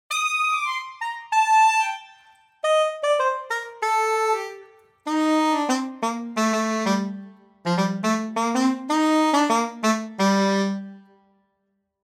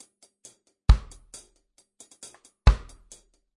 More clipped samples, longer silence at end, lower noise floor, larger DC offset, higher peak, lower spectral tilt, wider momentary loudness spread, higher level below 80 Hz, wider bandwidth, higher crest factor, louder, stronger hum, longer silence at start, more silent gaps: neither; first, 1.05 s vs 0.8 s; first, -74 dBFS vs -66 dBFS; neither; about the same, -8 dBFS vs -6 dBFS; about the same, -4.5 dB/octave vs -5.5 dB/octave; second, 10 LU vs 23 LU; second, -76 dBFS vs -28 dBFS; first, 17 kHz vs 11 kHz; second, 14 dB vs 22 dB; first, -22 LUFS vs -25 LUFS; neither; second, 0.1 s vs 0.9 s; neither